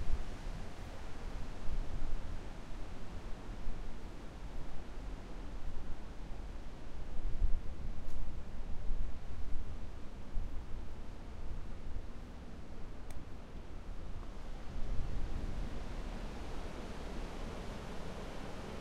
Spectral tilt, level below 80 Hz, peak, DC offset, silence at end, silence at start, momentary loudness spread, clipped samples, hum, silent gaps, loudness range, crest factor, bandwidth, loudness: -6 dB/octave; -40 dBFS; -16 dBFS; under 0.1%; 0 s; 0 s; 7 LU; under 0.1%; none; none; 4 LU; 18 dB; 7.4 kHz; -47 LUFS